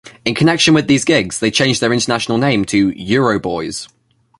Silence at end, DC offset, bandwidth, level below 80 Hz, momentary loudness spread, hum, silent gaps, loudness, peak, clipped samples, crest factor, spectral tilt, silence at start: 0.55 s; under 0.1%; 11.5 kHz; -46 dBFS; 9 LU; none; none; -14 LUFS; 0 dBFS; under 0.1%; 14 dB; -4.5 dB/octave; 0.05 s